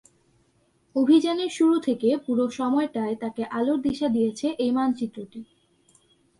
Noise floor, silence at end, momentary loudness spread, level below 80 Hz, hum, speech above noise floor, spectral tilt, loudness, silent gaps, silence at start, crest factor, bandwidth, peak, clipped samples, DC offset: -65 dBFS; 0.95 s; 11 LU; -64 dBFS; none; 42 dB; -5.5 dB/octave; -24 LUFS; none; 0.95 s; 16 dB; 11.5 kHz; -8 dBFS; under 0.1%; under 0.1%